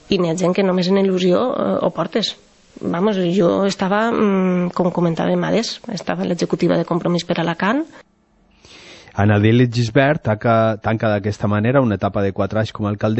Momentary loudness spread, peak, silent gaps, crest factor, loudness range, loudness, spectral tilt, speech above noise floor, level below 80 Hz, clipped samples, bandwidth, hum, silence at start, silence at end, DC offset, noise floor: 6 LU; -2 dBFS; none; 16 dB; 3 LU; -18 LUFS; -6.5 dB/octave; 39 dB; -50 dBFS; under 0.1%; 8.4 kHz; none; 0.1 s; 0 s; under 0.1%; -56 dBFS